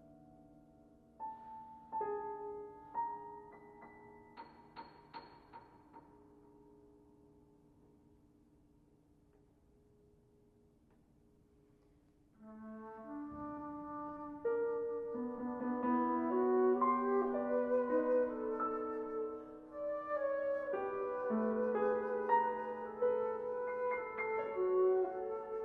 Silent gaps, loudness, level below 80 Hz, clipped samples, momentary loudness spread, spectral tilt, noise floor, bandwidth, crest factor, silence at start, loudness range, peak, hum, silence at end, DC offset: none; -37 LUFS; -74 dBFS; under 0.1%; 22 LU; -8.5 dB/octave; -69 dBFS; 4.6 kHz; 20 dB; 0 s; 22 LU; -20 dBFS; none; 0 s; under 0.1%